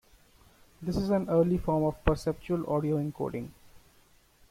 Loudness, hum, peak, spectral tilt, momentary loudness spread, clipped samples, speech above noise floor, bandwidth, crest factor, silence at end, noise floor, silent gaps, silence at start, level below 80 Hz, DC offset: -30 LUFS; none; -8 dBFS; -8 dB/octave; 10 LU; under 0.1%; 33 dB; 16 kHz; 22 dB; 0.75 s; -62 dBFS; none; 0.8 s; -44 dBFS; under 0.1%